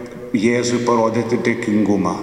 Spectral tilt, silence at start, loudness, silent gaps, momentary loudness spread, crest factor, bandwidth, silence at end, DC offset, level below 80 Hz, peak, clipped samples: -5.5 dB/octave; 0 s; -18 LUFS; none; 3 LU; 16 dB; 11.5 kHz; 0 s; under 0.1%; -52 dBFS; -2 dBFS; under 0.1%